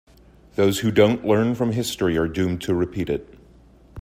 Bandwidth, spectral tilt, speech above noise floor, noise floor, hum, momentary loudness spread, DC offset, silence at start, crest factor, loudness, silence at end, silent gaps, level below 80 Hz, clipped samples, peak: 16 kHz; -6 dB/octave; 30 dB; -50 dBFS; none; 9 LU; under 0.1%; 0.6 s; 20 dB; -22 LUFS; 0 s; none; -48 dBFS; under 0.1%; -2 dBFS